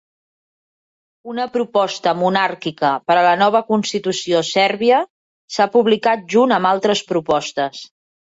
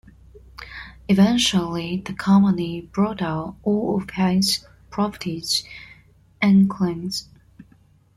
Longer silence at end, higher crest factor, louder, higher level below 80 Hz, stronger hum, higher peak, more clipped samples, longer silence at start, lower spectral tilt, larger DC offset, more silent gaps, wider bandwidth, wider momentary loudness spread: about the same, 0.5 s vs 0.55 s; about the same, 16 dB vs 16 dB; first, -17 LUFS vs -21 LUFS; second, -64 dBFS vs -50 dBFS; neither; first, -2 dBFS vs -6 dBFS; neither; first, 1.25 s vs 0.35 s; about the same, -4 dB/octave vs -5 dB/octave; neither; first, 5.10-5.48 s vs none; second, 8 kHz vs 13 kHz; second, 9 LU vs 18 LU